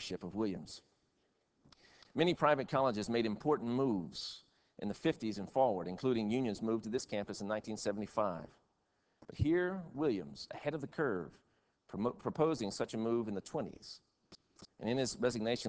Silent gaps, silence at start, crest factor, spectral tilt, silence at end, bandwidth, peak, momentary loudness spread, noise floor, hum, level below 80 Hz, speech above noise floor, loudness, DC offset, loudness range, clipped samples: none; 0 s; 22 dB; -5.5 dB/octave; 0 s; 8 kHz; -14 dBFS; 13 LU; -79 dBFS; none; -62 dBFS; 43 dB; -37 LUFS; under 0.1%; 4 LU; under 0.1%